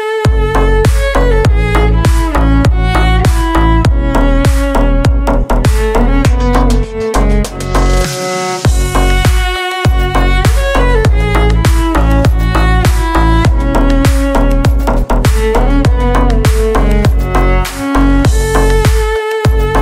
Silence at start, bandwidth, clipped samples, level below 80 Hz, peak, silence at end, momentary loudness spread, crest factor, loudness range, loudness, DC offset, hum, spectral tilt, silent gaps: 0 s; 15 kHz; under 0.1%; -12 dBFS; 0 dBFS; 0 s; 3 LU; 8 dB; 2 LU; -11 LUFS; under 0.1%; none; -6 dB/octave; none